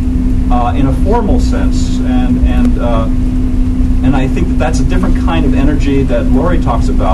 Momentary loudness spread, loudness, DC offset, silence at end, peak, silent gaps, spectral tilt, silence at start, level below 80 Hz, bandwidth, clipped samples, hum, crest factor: 3 LU; -13 LUFS; under 0.1%; 0 s; 0 dBFS; none; -7.5 dB/octave; 0 s; -12 dBFS; 11 kHz; under 0.1%; none; 8 dB